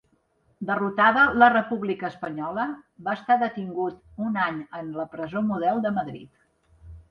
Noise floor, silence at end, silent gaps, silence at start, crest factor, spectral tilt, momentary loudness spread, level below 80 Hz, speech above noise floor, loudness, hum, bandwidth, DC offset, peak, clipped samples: -66 dBFS; 0.1 s; none; 0.6 s; 20 dB; -8 dB/octave; 15 LU; -58 dBFS; 42 dB; -24 LUFS; none; 5.8 kHz; under 0.1%; -4 dBFS; under 0.1%